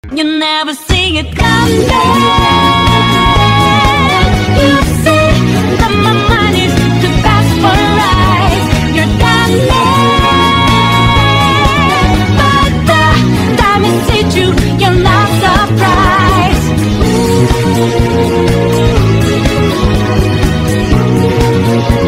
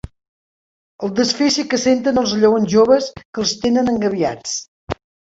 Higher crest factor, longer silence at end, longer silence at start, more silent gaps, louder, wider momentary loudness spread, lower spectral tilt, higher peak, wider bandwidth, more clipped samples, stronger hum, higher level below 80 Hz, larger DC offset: second, 8 dB vs 16 dB; second, 0 s vs 0.4 s; about the same, 0.05 s vs 0.05 s; second, none vs 0.28-0.99 s, 3.25-3.33 s, 4.68-4.87 s; first, -9 LUFS vs -17 LUFS; second, 3 LU vs 13 LU; first, -5.5 dB/octave vs -4 dB/octave; about the same, 0 dBFS vs -2 dBFS; first, 16 kHz vs 8 kHz; neither; neither; first, -20 dBFS vs -48 dBFS; neither